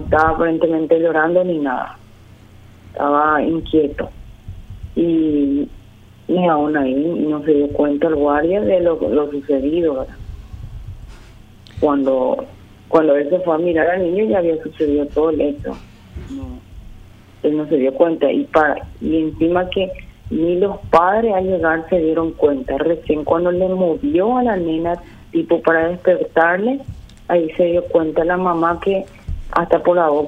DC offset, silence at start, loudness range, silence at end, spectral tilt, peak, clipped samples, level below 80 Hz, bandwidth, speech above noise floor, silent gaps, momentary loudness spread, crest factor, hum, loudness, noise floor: under 0.1%; 0 s; 4 LU; 0 s; -8 dB/octave; 0 dBFS; under 0.1%; -38 dBFS; 7 kHz; 27 dB; none; 16 LU; 16 dB; none; -17 LUFS; -43 dBFS